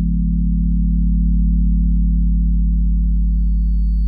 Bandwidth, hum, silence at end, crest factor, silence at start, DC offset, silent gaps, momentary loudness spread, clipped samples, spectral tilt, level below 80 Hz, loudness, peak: 0.3 kHz; none; 0 s; 8 dB; 0 s; under 0.1%; none; 2 LU; under 0.1%; -14 dB/octave; -16 dBFS; -18 LUFS; -8 dBFS